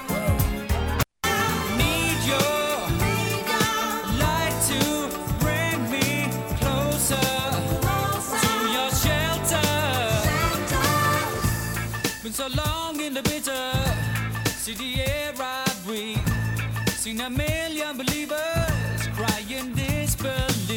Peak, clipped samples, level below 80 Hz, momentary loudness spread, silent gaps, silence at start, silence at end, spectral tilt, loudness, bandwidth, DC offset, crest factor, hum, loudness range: -8 dBFS; under 0.1%; -36 dBFS; 5 LU; none; 0 s; 0 s; -4 dB/octave; -24 LUFS; 17.5 kHz; under 0.1%; 16 dB; none; 4 LU